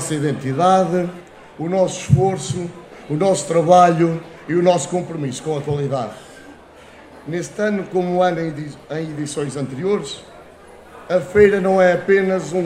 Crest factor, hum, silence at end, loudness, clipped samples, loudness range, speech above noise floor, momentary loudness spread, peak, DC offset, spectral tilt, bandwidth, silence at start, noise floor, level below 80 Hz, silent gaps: 18 dB; none; 0 s; -18 LUFS; under 0.1%; 6 LU; 25 dB; 15 LU; 0 dBFS; under 0.1%; -6 dB/octave; 13 kHz; 0 s; -43 dBFS; -50 dBFS; none